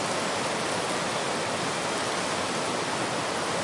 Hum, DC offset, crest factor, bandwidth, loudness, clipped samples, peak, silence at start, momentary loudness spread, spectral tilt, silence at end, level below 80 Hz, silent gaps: none; under 0.1%; 14 dB; 11.5 kHz; -28 LUFS; under 0.1%; -14 dBFS; 0 s; 1 LU; -2.5 dB/octave; 0 s; -64 dBFS; none